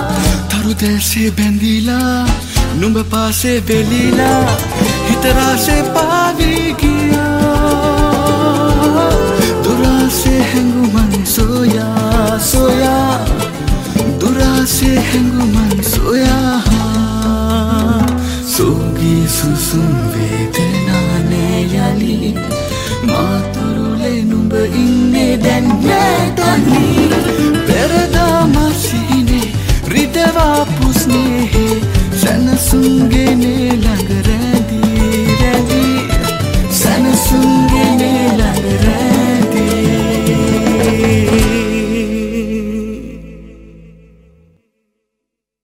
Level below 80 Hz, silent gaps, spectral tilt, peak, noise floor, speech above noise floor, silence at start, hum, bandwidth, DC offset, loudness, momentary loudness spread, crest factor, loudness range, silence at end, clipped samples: -22 dBFS; none; -5 dB/octave; 0 dBFS; -77 dBFS; 65 dB; 0 s; none; 16.5 kHz; under 0.1%; -12 LUFS; 5 LU; 12 dB; 3 LU; 1.75 s; under 0.1%